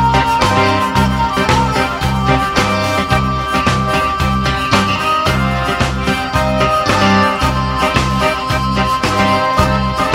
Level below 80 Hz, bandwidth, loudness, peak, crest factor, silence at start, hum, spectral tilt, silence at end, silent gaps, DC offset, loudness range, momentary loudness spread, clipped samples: -26 dBFS; 16 kHz; -14 LUFS; 0 dBFS; 14 dB; 0 s; none; -5 dB/octave; 0 s; none; under 0.1%; 1 LU; 3 LU; under 0.1%